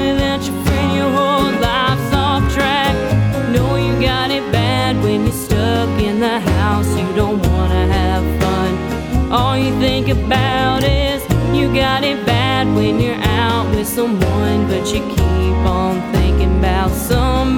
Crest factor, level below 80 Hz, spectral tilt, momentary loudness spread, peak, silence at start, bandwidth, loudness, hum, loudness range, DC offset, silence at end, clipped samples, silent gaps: 14 dB; -22 dBFS; -6 dB/octave; 3 LU; 0 dBFS; 0 s; 19 kHz; -15 LUFS; none; 1 LU; under 0.1%; 0 s; under 0.1%; none